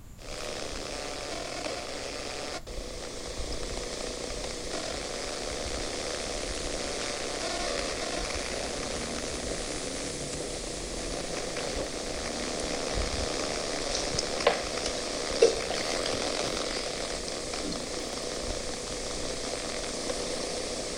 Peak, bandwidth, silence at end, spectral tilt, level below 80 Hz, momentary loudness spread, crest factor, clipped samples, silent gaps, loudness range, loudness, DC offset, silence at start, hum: -6 dBFS; 16 kHz; 0 s; -2.5 dB/octave; -44 dBFS; 6 LU; 26 dB; under 0.1%; none; 7 LU; -32 LUFS; under 0.1%; 0 s; none